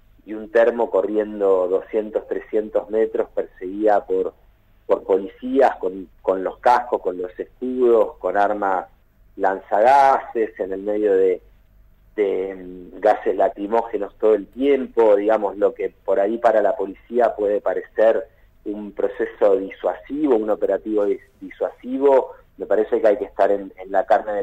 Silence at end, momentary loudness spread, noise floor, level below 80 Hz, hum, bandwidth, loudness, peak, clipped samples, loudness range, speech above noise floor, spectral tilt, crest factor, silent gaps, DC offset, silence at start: 0 s; 11 LU; -52 dBFS; -52 dBFS; none; 8.8 kHz; -20 LUFS; -6 dBFS; under 0.1%; 3 LU; 32 dB; -6.5 dB/octave; 14 dB; none; under 0.1%; 0.25 s